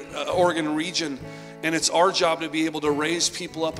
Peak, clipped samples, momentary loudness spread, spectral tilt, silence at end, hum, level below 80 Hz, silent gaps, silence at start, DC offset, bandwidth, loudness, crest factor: -6 dBFS; under 0.1%; 9 LU; -3 dB/octave; 0 s; none; -58 dBFS; none; 0 s; under 0.1%; 15 kHz; -23 LUFS; 18 dB